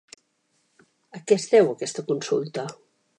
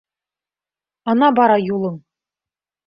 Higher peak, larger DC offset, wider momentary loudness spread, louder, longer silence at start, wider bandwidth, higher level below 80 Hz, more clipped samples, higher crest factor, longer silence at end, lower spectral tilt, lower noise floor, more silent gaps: second, -6 dBFS vs -2 dBFS; neither; first, 19 LU vs 15 LU; second, -23 LUFS vs -16 LUFS; about the same, 1.15 s vs 1.05 s; first, 10.5 kHz vs 5.4 kHz; second, -80 dBFS vs -64 dBFS; neither; about the same, 20 dB vs 18 dB; second, 0.45 s vs 0.9 s; second, -4.5 dB/octave vs -10 dB/octave; second, -70 dBFS vs under -90 dBFS; neither